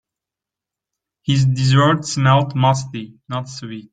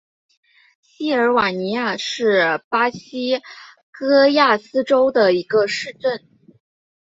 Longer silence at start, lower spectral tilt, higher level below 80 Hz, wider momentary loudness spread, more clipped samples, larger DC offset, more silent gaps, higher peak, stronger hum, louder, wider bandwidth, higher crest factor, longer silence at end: first, 1.25 s vs 1 s; about the same, -5.5 dB/octave vs -4.5 dB/octave; first, -52 dBFS vs -64 dBFS; first, 16 LU vs 10 LU; neither; neither; second, none vs 2.64-2.71 s, 3.83-3.93 s; about the same, -2 dBFS vs -4 dBFS; neither; about the same, -17 LUFS vs -18 LUFS; first, 9.2 kHz vs 8 kHz; about the same, 16 dB vs 16 dB; second, 0.1 s vs 0.85 s